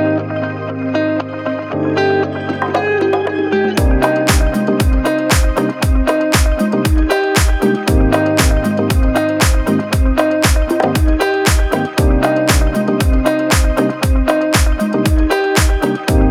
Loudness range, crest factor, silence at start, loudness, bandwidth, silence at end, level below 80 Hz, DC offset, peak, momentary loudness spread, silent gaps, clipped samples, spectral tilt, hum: 2 LU; 14 dB; 0 s; -14 LUFS; 16 kHz; 0 s; -18 dBFS; under 0.1%; 0 dBFS; 4 LU; none; under 0.1%; -5.5 dB/octave; none